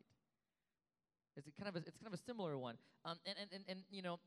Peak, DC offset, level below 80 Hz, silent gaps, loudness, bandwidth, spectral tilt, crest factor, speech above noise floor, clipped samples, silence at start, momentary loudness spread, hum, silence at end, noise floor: -32 dBFS; under 0.1%; under -90 dBFS; none; -50 LUFS; 13 kHz; -5.5 dB/octave; 20 dB; over 40 dB; under 0.1%; 1.35 s; 9 LU; none; 0.05 s; under -90 dBFS